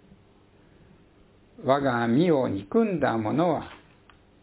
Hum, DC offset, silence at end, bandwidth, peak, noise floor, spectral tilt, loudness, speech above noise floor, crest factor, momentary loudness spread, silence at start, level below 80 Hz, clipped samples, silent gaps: none; under 0.1%; 0.65 s; 4 kHz; -8 dBFS; -57 dBFS; -11 dB/octave; -25 LUFS; 34 dB; 20 dB; 8 LU; 1.6 s; -58 dBFS; under 0.1%; none